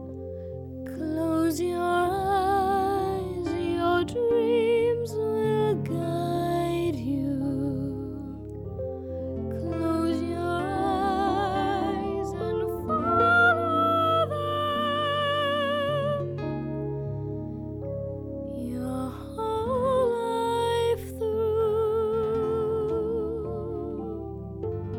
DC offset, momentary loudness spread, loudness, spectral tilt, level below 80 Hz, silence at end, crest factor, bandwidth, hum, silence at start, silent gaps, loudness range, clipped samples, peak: under 0.1%; 11 LU; -27 LUFS; -6.5 dB/octave; -48 dBFS; 0 s; 16 dB; 17 kHz; none; 0 s; none; 7 LU; under 0.1%; -10 dBFS